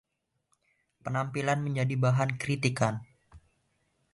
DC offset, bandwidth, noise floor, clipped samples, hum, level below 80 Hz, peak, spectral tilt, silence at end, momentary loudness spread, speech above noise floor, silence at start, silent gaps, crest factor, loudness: under 0.1%; 11.5 kHz; -76 dBFS; under 0.1%; none; -64 dBFS; -10 dBFS; -6 dB/octave; 0.75 s; 8 LU; 48 dB; 1.05 s; none; 22 dB; -29 LUFS